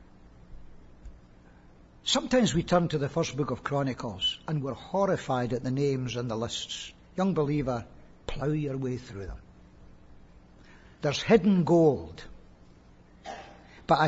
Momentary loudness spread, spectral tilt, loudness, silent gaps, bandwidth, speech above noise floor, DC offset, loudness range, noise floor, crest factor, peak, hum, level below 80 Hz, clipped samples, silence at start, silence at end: 20 LU; -5.5 dB/octave; -28 LUFS; none; 8 kHz; 27 dB; under 0.1%; 5 LU; -55 dBFS; 22 dB; -8 dBFS; none; -50 dBFS; under 0.1%; 0 s; 0 s